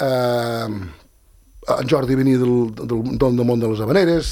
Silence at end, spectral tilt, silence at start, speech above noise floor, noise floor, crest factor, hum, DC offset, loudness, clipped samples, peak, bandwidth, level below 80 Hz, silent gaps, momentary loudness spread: 0 s; -7 dB/octave; 0 s; 34 dB; -52 dBFS; 16 dB; none; under 0.1%; -19 LUFS; under 0.1%; -2 dBFS; 18 kHz; -40 dBFS; none; 10 LU